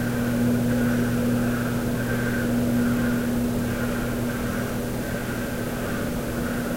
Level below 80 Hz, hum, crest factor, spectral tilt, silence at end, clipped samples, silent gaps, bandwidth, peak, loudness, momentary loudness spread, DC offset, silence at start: -38 dBFS; none; 12 dB; -6 dB/octave; 0 s; under 0.1%; none; 16 kHz; -12 dBFS; -25 LUFS; 6 LU; under 0.1%; 0 s